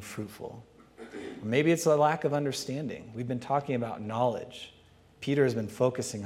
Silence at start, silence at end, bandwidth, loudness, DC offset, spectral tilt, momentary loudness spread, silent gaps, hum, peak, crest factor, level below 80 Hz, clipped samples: 0 s; 0 s; 16 kHz; -29 LUFS; under 0.1%; -5.5 dB/octave; 19 LU; none; none; -10 dBFS; 20 dB; -68 dBFS; under 0.1%